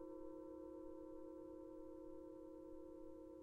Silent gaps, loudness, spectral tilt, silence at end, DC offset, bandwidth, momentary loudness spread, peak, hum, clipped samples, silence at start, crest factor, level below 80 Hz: none; -56 LUFS; -8.5 dB/octave; 0 s; under 0.1%; 10 kHz; 2 LU; -42 dBFS; none; under 0.1%; 0 s; 12 dB; -72 dBFS